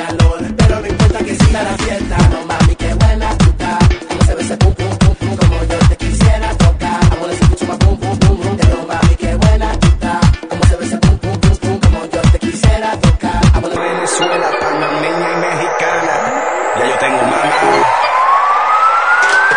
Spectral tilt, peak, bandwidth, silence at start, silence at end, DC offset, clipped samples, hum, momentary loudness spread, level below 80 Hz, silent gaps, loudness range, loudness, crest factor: -5.5 dB/octave; 0 dBFS; 10.5 kHz; 0 s; 0 s; under 0.1%; under 0.1%; none; 4 LU; -16 dBFS; none; 2 LU; -13 LUFS; 12 dB